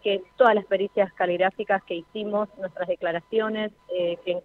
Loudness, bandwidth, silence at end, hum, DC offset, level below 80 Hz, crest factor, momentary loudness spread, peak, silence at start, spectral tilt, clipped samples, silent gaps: -25 LUFS; 4.4 kHz; 0.05 s; none; under 0.1%; -68 dBFS; 20 dB; 11 LU; -4 dBFS; 0.05 s; -7 dB/octave; under 0.1%; none